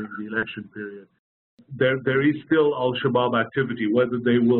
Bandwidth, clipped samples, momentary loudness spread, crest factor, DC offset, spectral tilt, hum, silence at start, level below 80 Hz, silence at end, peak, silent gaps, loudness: 4.2 kHz; under 0.1%; 14 LU; 14 dB; under 0.1%; -5 dB/octave; none; 0 s; -64 dBFS; 0 s; -10 dBFS; 1.19-1.57 s; -22 LUFS